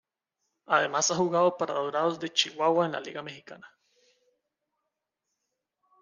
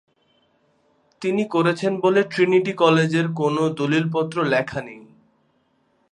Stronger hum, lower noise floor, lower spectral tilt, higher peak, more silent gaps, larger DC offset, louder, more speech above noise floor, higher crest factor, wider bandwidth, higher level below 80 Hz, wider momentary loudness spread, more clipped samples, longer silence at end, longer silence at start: neither; first, -84 dBFS vs -65 dBFS; second, -3 dB/octave vs -6.5 dB/octave; second, -8 dBFS vs -2 dBFS; neither; neither; second, -27 LUFS vs -20 LUFS; first, 57 dB vs 45 dB; about the same, 22 dB vs 20 dB; about the same, 10 kHz vs 11 kHz; second, -80 dBFS vs -64 dBFS; first, 14 LU vs 8 LU; neither; first, 2.35 s vs 1.1 s; second, 0.7 s vs 1.2 s